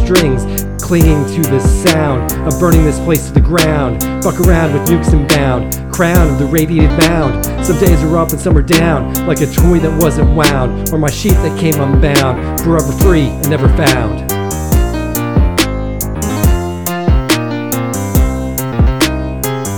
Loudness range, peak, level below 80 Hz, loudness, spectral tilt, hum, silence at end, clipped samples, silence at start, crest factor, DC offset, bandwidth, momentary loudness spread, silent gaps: 3 LU; 0 dBFS; -16 dBFS; -12 LUFS; -5.5 dB/octave; none; 0 s; 0.3%; 0 s; 12 dB; 1%; 19.5 kHz; 7 LU; none